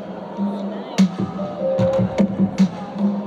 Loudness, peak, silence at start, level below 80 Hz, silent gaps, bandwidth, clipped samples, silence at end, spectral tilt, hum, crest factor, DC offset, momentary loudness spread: -21 LUFS; -6 dBFS; 0 s; -50 dBFS; none; 8 kHz; under 0.1%; 0 s; -7.5 dB/octave; none; 14 dB; under 0.1%; 7 LU